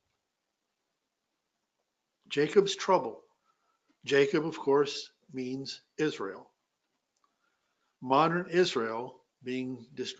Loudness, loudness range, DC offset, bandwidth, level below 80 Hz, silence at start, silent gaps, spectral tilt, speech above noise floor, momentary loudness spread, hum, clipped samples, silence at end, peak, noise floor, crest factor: -30 LUFS; 5 LU; under 0.1%; 8 kHz; -80 dBFS; 2.3 s; none; -5 dB/octave; 55 dB; 16 LU; none; under 0.1%; 0.05 s; -10 dBFS; -84 dBFS; 22 dB